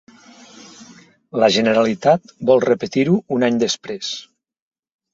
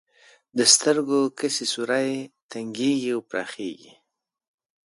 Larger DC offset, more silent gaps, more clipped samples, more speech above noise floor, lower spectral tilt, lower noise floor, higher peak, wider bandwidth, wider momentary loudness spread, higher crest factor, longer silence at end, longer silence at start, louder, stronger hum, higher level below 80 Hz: neither; second, none vs 2.42-2.49 s; neither; second, 30 dB vs 52 dB; first, -5 dB/octave vs -2 dB/octave; second, -47 dBFS vs -76 dBFS; about the same, -2 dBFS vs -2 dBFS; second, 7.8 kHz vs 11.5 kHz; second, 11 LU vs 18 LU; second, 18 dB vs 24 dB; second, 0.9 s vs 1.1 s; first, 0.8 s vs 0.55 s; first, -18 LUFS vs -22 LUFS; neither; first, -60 dBFS vs -76 dBFS